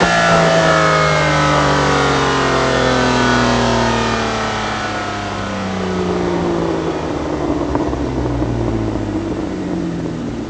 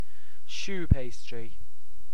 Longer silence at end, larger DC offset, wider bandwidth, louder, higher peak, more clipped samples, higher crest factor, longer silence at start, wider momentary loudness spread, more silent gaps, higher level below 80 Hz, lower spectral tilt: about the same, 0 s vs 0.1 s; second, under 0.1% vs 10%; second, 10 kHz vs 16 kHz; first, -16 LUFS vs -32 LUFS; first, 0 dBFS vs -4 dBFS; neither; second, 16 dB vs 28 dB; second, 0 s vs 0.5 s; second, 9 LU vs 16 LU; neither; about the same, -32 dBFS vs -36 dBFS; about the same, -5 dB/octave vs -6 dB/octave